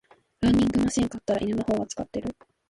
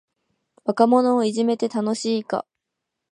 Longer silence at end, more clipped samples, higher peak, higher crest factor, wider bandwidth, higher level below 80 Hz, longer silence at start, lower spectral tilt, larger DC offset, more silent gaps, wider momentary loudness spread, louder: second, 0.4 s vs 0.7 s; neither; second, -12 dBFS vs -2 dBFS; second, 14 dB vs 20 dB; about the same, 11.5 kHz vs 11 kHz; first, -46 dBFS vs -78 dBFS; second, 0.4 s vs 0.65 s; about the same, -5.5 dB/octave vs -5.5 dB/octave; neither; neither; about the same, 11 LU vs 12 LU; second, -26 LUFS vs -21 LUFS